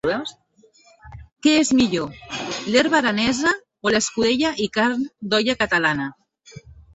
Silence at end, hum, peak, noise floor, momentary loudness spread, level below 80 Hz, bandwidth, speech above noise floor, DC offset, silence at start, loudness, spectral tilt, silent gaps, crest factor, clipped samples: 0.35 s; none; -4 dBFS; -55 dBFS; 11 LU; -52 dBFS; 8.2 kHz; 35 dB; under 0.1%; 0.05 s; -20 LUFS; -3.5 dB/octave; none; 18 dB; under 0.1%